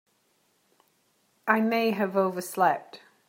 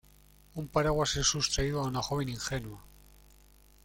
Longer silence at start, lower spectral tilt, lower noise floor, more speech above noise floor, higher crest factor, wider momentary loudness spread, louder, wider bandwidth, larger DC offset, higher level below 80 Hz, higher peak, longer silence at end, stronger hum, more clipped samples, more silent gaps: first, 1.45 s vs 0.55 s; first, -5 dB/octave vs -3.5 dB/octave; first, -69 dBFS vs -59 dBFS; first, 44 dB vs 28 dB; about the same, 22 dB vs 20 dB; second, 7 LU vs 17 LU; first, -26 LUFS vs -30 LUFS; about the same, 16.5 kHz vs 17 kHz; neither; second, -80 dBFS vs -46 dBFS; first, -6 dBFS vs -14 dBFS; second, 0.3 s vs 0.95 s; second, none vs 50 Hz at -50 dBFS; neither; neither